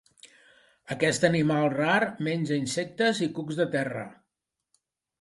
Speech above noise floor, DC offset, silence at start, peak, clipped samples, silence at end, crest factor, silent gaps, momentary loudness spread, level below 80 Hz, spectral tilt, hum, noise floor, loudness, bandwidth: 58 dB; under 0.1%; 0.25 s; -6 dBFS; under 0.1%; 1.1 s; 22 dB; none; 9 LU; -66 dBFS; -5 dB/octave; none; -84 dBFS; -26 LUFS; 11.5 kHz